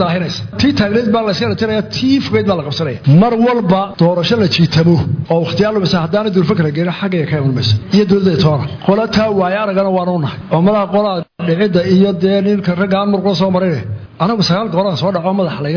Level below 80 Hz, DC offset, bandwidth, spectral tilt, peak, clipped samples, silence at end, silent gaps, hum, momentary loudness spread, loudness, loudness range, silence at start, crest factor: -42 dBFS; under 0.1%; 5.4 kHz; -7.5 dB/octave; -2 dBFS; under 0.1%; 0 s; none; none; 6 LU; -13 LUFS; 2 LU; 0 s; 12 dB